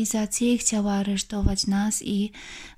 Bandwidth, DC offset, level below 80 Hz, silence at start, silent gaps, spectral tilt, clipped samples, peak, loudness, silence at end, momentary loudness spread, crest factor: 15.5 kHz; under 0.1%; -38 dBFS; 0 s; none; -4 dB/octave; under 0.1%; -6 dBFS; -24 LUFS; 0.05 s; 6 LU; 18 dB